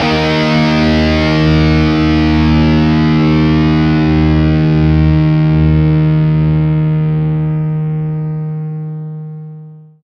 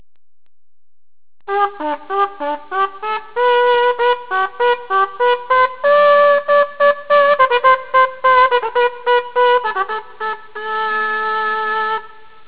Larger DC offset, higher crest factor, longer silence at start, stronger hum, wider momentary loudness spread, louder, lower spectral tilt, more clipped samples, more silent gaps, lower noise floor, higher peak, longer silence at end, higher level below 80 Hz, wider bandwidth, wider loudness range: second, under 0.1% vs 1%; about the same, 12 dB vs 16 dB; second, 0 s vs 1.5 s; neither; about the same, 10 LU vs 11 LU; first, -12 LUFS vs -15 LUFS; first, -8 dB/octave vs -5.5 dB/octave; neither; neither; about the same, -33 dBFS vs -36 dBFS; about the same, 0 dBFS vs 0 dBFS; second, 0.25 s vs 0.4 s; first, -24 dBFS vs -60 dBFS; first, 6.6 kHz vs 4 kHz; about the same, 5 LU vs 6 LU